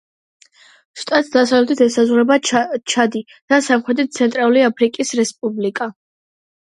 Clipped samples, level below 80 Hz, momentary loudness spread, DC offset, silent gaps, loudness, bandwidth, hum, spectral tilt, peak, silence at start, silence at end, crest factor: under 0.1%; -68 dBFS; 8 LU; under 0.1%; 3.42-3.48 s; -16 LUFS; 11.5 kHz; none; -3.5 dB/octave; 0 dBFS; 0.95 s; 0.8 s; 16 dB